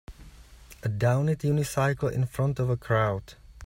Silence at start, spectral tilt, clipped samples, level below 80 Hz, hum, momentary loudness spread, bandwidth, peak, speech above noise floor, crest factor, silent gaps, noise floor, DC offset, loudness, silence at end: 0.1 s; -7 dB/octave; under 0.1%; -50 dBFS; none; 6 LU; 16 kHz; -12 dBFS; 24 dB; 16 dB; none; -50 dBFS; under 0.1%; -27 LUFS; 0 s